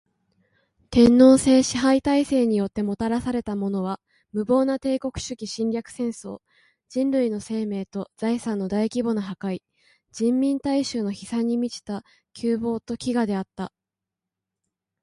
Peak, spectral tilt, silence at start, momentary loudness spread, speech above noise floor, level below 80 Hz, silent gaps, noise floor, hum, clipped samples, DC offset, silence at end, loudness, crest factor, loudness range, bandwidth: -4 dBFS; -5.5 dB/octave; 0.9 s; 15 LU; 65 dB; -52 dBFS; none; -87 dBFS; none; under 0.1%; under 0.1%; 1.35 s; -23 LUFS; 20 dB; 8 LU; 11.5 kHz